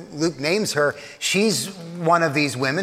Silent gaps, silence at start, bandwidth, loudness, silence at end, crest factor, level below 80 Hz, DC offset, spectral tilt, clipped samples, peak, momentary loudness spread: none; 0 s; 16 kHz; -21 LUFS; 0 s; 16 dB; -64 dBFS; under 0.1%; -4 dB/octave; under 0.1%; -4 dBFS; 7 LU